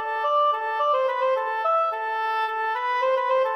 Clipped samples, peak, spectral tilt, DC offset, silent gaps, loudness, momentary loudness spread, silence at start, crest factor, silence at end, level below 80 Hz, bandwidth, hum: under 0.1%; -12 dBFS; -0.5 dB/octave; under 0.1%; none; -23 LUFS; 4 LU; 0 s; 10 dB; 0 s; -78 dBFS; 14 kHz; none